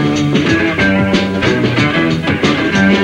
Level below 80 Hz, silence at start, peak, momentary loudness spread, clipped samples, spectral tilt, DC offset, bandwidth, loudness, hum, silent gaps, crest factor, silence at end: -36 dBFS; 0 s; 0 dBFS; 2 LU; under 0.1%; -6 dB/octave; under 0.1%; 10.5 kHz; -13 LUFS; none; none; 12 dB; 0 s